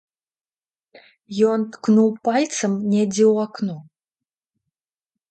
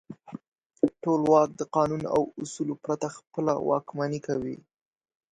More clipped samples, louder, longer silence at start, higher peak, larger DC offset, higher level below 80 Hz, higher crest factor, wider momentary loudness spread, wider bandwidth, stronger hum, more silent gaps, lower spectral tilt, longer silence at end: neither; first, -20 LUFS vs -27 LUFS; first, 1.3 s vs 0.1 s; about the same, -6 dBFS vs -8 dBFS; neither; second, -70 dBFS vs -64 dBFS; about the same, 16 dB vs 20 dB; second, 11 LU vs 19 LU; about the same, 9 kHz vs 9.6 kHz; neither; second, none vs 0.48-0.52 s, 0.66-0.70 s; second, -5.5 dB/octave vs -7 dB/octave; first, 1.5 s vs 0.75 s